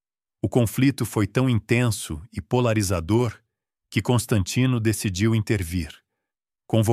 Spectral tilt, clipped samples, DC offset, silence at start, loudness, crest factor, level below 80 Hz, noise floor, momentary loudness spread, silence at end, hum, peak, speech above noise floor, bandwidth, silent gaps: -6 dB/octave; under 0.1%; under 0.1%; 0.45 s; -23 LUFS; 18 dB; -46 dBFS; -87 dBFS; 8 LU; 0 s; none; -6 dBFS; 65 dB; 15.5 kHz; none